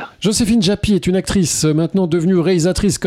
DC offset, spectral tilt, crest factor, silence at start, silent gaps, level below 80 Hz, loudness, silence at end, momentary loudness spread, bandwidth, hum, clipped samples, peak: under 0.1%; -5 dB/octave; 12 dB; 0 s; none; -34 dBFS; -15 LUFS; 0 s; 2 LU; 15.5 kHz; none; under 0.1%; -4 dBFS